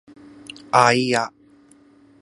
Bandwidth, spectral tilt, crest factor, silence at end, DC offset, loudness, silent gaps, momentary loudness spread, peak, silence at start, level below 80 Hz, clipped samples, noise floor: 11.5 kHz; -4 dB/octave; 22 dB; 0.95 s; under 0.1%; -18 LUFS; none; 24 LU; 0 dBFS; 0.75 s; -66 dBFS; under 0.1%; -52 dBFS